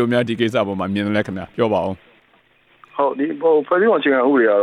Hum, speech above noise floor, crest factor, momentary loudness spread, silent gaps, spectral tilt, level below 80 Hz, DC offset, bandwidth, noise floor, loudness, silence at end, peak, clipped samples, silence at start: none; 39 dB; 14 dB; 9 LU; none; -7 dB/octave; -60 dBFS; under 0.1%; 11 kHz; -56 dBFS; -18 LUFS; 0 s; -4 dBFS; under 0.1%; 0 s